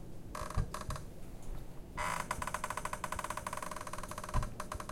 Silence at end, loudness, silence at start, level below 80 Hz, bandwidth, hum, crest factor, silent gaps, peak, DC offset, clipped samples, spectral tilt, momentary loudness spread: 0 s; -41 LUFS; 0 s; -46 dBFS; 17 kHz; none; 20 dB; none; -20 dBFS; under 0.1%; under 0.1%; -4 dB/octave; 11 LU